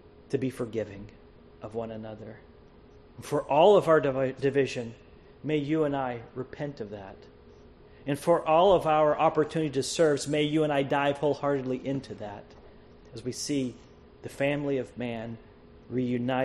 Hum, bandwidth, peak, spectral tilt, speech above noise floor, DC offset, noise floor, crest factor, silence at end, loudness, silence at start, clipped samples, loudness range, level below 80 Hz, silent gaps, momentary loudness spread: none; 12.5 kHz; -8 dBFS; -5.5 dB/octave; 26 dB; under 0.1%; -53 dBFS; 20 dB; 0 s; -27 LUFS; 0.3 s; under 0.1%; 9 LU; -58 dBFS; none; 20 LU